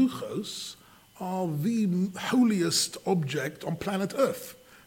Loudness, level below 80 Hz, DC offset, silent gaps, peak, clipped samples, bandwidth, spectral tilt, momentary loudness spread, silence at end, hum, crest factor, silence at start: -28 LUFS; -66 dBFS; under 0.1%; none; -12 dBFS; under 0.1%; 17 kHz; -4.5 dB/octave; 13 LU; 0.1 s; none; 16 dB; 0 s